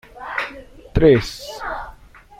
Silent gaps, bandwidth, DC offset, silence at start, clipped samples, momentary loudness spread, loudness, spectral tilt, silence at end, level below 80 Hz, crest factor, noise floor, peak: none; 15.5 kHz; under 0.1%; 0.15 s; under 0.1%; 17 LU; -20 LUFS; -6.5 dB/octave; 0.5 s; -34 dBFS; 18 dB; -43 dBFS; -2 dBFS